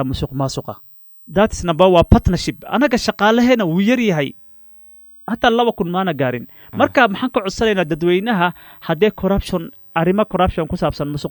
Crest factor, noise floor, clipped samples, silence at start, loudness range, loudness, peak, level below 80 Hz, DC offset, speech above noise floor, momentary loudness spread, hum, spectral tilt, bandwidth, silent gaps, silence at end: 18 dB; -43 dBFS; under 0.1%; 0 s; 4 LU; -17 LUFS; 0 dBFS; -32 dBFS; under 0.1%; 27 dB; 11 LU; none; -6 dB/octave; 19.5 kHz; none; 0 s